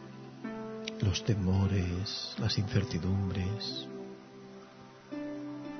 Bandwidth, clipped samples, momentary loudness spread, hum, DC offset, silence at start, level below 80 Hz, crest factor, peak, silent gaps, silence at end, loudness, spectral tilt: 6.4 kHz; under 0.1%; 20 LU; none; under 0.1%; 0 s; -56 dBFS; 18 dB; -16 dBFS; none; 0 s; -34 LUFS; -6 dB/octave